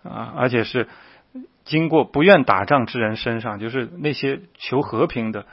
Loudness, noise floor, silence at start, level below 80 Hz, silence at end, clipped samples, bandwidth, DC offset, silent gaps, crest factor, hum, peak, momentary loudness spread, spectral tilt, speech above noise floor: -20 LUFS; -41 dBFS; 0.05 s; -54 dBFS; 0.1 s; under 0.1%; 5.8 kHz; under 0.1%; none; 20 dB; none; 0 dBFS; 13 LU; -9 dB/octave; 21 dB